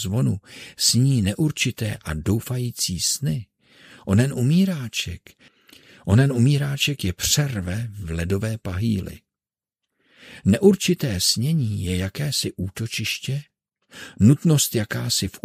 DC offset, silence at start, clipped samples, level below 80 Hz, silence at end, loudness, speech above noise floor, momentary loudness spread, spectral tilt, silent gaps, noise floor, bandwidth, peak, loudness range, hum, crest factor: under 0.1%; 0 s; under 0.1%; -50 dBFS; 0.05 s; -22 LUFS; over 68 dB; 12 LU; -4.5 dB/octave; none; under -90 dBFS; 16 kHz; -2 dBFS; 3 LU; none; 20 dB